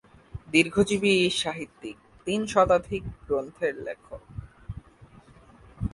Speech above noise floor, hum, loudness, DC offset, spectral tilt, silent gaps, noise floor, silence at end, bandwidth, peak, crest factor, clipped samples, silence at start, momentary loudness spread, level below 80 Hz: 27 dB; none; -25 LUFS; under 0.1%; -4.5 dB/octave; none; -53 dBFS; 0.05 s; 11.5 kHz; -6 dBFS; 22 dB; under 0.1%; 0.35 s; 21 LU; -48 dBFS